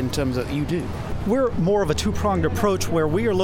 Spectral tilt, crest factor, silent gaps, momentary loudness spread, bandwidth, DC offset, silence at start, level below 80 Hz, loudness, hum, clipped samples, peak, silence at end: -6 dB/octave; 14 dB; none; 5 LU; 17 kHz; under 0.1%; 0 s; -36 dBFS; -22 LUFS; none; under 0.1%; -8 dBFS; 0 s